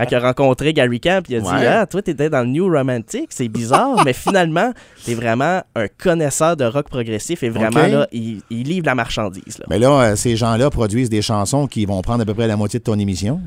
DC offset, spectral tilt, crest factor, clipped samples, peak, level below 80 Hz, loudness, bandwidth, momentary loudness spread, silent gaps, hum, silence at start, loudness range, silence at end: under 0.1%; -5.5 dB/octave; 16 dB; under 0.1%; 0 dBFS; -40 dBFS; -17 LUFS; 16 kHz; 9 LU; none; none; 0 s; 2 LU; 0 s